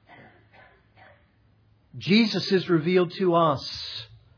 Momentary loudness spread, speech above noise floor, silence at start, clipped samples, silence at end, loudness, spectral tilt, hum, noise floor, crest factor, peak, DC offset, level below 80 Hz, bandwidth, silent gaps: 13 LU; 39 dB; 1.95 s; under 0.1%; 0.3 s; -23 LUFS; -6.5 dB/octave; none; -61 dBFS; 18 dB; -8 dBFS; under 0.1%; -64 dBFS; 5.4 kHz; none